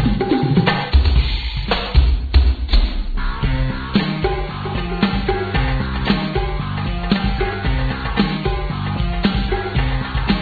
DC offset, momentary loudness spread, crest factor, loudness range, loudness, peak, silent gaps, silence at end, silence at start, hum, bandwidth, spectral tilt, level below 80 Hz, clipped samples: under 0.1%; 7 LU; 16 dB; 3 LU; -19 LUFS; -2 dBFS; none; 0 s; 0 s; none; 4.9 kHz; -8.5 dB/octave; -20 dBFS; under 0.1%